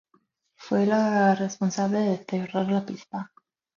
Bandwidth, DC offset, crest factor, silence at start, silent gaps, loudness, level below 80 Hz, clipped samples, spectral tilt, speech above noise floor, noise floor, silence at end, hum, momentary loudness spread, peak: 7.4 kHz; under 0.1%; 16 dB; 0.6 s; none; -25 LUFS; -70 dBFS; under 0.1%; -6.5 dB/octave; 44 dB; -68 dBFS; 0.5 s; none; 14 LU; -10 dBFS